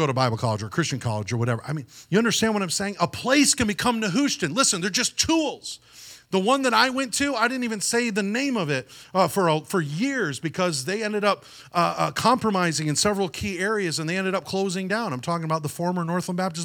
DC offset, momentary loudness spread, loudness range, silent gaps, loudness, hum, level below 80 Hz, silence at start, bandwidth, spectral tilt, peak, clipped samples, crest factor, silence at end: under 0.1%; 7 LU; 3 LU; none; -23 LUFS; none; -56 dBFS; 0 s; 19 kHz; -4 dB/octave; -4 dBFS; under 0.1%; 20 dB; 0 s